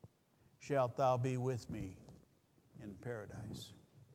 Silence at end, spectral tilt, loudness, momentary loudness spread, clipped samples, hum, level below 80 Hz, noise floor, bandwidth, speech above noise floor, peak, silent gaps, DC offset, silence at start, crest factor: 0 s; -7 dB/octave; -40 LUFS; 20 LU; under 0.1%; none; -68 dBFS; -72 dBFS; 15.5 kHz; 33 dB; -22 dBFS; none; under 0.1%; 0.05 s; 20 dB